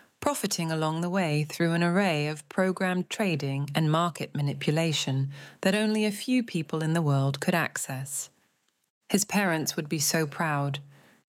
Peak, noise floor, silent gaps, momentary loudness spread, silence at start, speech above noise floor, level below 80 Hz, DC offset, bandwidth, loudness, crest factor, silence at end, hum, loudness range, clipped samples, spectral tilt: -8 dBFS; -72 dBFS; 8.90-9.01 s; 6 LU; 0.2 s; 44 dB; -72 dBFS; under 0.1%; 17 kHz; -28 LUFS; 20 dB; 0.4 s; none; 2 LU; under 0.1%; -5 dB/octave